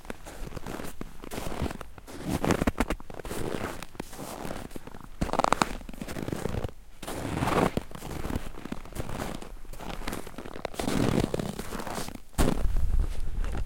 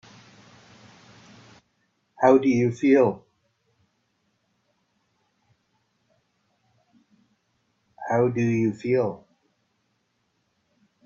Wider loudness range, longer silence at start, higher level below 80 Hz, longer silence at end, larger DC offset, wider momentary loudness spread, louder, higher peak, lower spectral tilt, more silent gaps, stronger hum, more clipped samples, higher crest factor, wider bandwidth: about the same, 3 LU vs 5 LU; second, 0 s vs 2.2 s; first, -36 dBFS vs -68 dBFS; second, 0 s vs 1.9 s; first, 0.2% vs under 0.1%; about the same, 15 LU vs 14 LU; second, -33 LUFS vs -22 LUFS; about the same, -2 dBFS vs -4 dBFS; second, -5.5 dB/octave vs -8 dB/octave; neither; neither; neither; first, 28 dB vs 22 dB; first, 17 kHz vs 7.6 kHz